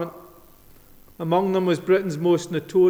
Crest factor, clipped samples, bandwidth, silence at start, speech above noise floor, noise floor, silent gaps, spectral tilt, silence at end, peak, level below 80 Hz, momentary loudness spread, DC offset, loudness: 14 dB; under 0.1%; 14.5 kHz; 0 s; 29 dB; -49 dBFS; none; -6.5 dB/octave; 0 s; -8 dBFS; -58 dBFS; 7 LU; under 0.1%; -22 LUFS